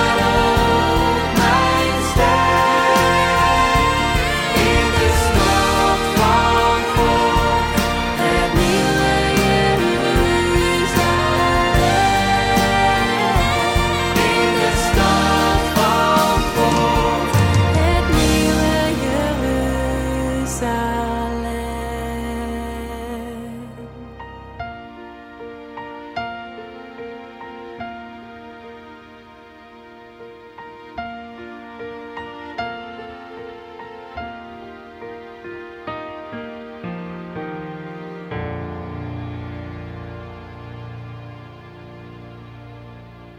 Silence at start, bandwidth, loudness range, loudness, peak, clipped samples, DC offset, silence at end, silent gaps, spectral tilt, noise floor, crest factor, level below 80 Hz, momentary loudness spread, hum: 0 s; 16.5 kHz; 20 LU; -17 LUFS; -4 dBFS; under 0.1%; under 0.1%; 0 s; none; -4.5 dB/octave; -43 dBFS; 14 dB; -30 dBFS; 21 LU; none